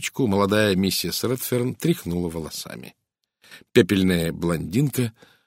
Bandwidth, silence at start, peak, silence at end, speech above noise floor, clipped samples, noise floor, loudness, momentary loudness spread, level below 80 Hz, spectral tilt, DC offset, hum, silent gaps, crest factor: 16 kHz; 0 s; -2 dBFS; 0.35 s; 38 dB; under 0.1%; -61 dBFS; -23 LUFS; 11 LU; -50 dBFS; -5 dB/octave; under 0.1%; none; none; 22 dB